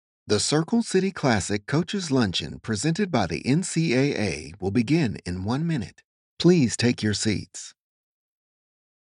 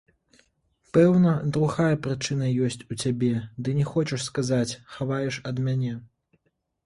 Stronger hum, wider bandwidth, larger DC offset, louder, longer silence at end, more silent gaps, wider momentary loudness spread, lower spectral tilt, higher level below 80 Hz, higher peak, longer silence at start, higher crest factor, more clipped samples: neither; about the same, 11.5 kHz vs 11.5 kHz; neither; about the same, -24 LUFS vs -25 LUFS; first, 1.35 s vs 0.8 s; first, 6.04-6.37 s vs none; about the same, 9 LU vs 9 LU; second, -5 dB/octave vs -6.5 dB/octave; about the same, -54 dBFS vs -58 dBFS; about the same, -6 dBFS vs -8 dBFS; second, 0.25 s vs 0.95 s; about the same, 20 dB vs 18 dB; neither